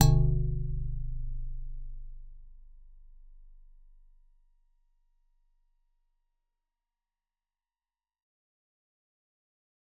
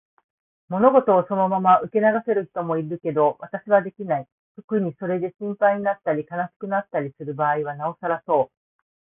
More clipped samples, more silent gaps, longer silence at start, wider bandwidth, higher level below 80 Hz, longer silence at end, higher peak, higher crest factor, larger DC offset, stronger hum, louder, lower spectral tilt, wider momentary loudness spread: neither; second, none vs 4.32-4.55 s, 4.64-4.68 s, 6.56-6.60 s; second, 0 s vs 0.7 s; about the same, 3.9 kHz vs 3.7 kHz; first, -38 dBFS vs -68 dBFS; first, 6.45 s vs 0.65 s; about the same, -4 dBFS vs -2 dBFS; first, 30 dB vs 20 dB; neither; neither; second, -33 LUFS vs -22 LUFS; second, -10 dB/octave vs -12 dB/octave; first, 24 LU vs 11 LU